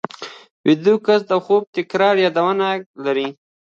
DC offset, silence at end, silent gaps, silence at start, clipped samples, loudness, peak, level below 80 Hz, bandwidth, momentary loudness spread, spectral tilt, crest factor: under 0.1%; 0.35 s; 0.51-0.64 s, 1.67-1.73 s, 2.86-2.94 s; 0.2 s; under 0.1%; -18 LUFS; -2 dBFS; -70 dBFS; 7.4 kHz; 12 LU; -6 dB/octave; 16 dB